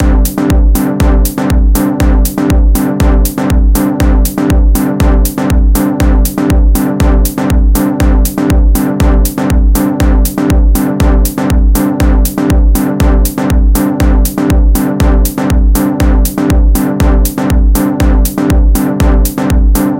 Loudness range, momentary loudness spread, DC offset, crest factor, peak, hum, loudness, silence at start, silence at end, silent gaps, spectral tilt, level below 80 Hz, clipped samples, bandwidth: 0 LU; 2 LU; 0.2%; 8 dB; 0 dBFS; none; -10 LUFS; 0 s; 0 s; none; -6.5 dB/octave; -10 dBFS; under 0.1%; 17 kHz